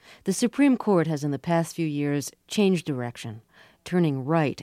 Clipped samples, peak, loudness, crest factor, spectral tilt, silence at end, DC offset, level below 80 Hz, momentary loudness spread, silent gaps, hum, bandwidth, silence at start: under 0.1%; -8 dBFS; -25 LUFS; 16 dB; -6 dB/octave; 0 s; under 0.1%; -68 dBFS; 12 LU; none; none; 15.5 kHz; 0.1 s